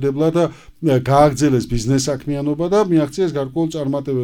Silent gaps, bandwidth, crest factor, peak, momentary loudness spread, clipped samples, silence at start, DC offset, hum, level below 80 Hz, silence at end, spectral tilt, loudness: none; 16.5 kHz; 16 dB; 0 dBFS; 8 LU; under 0.1%; 0 s; under 0.1%; none; -38 dBFS; 0 s; -6.5 dB/octave; -18 LUFS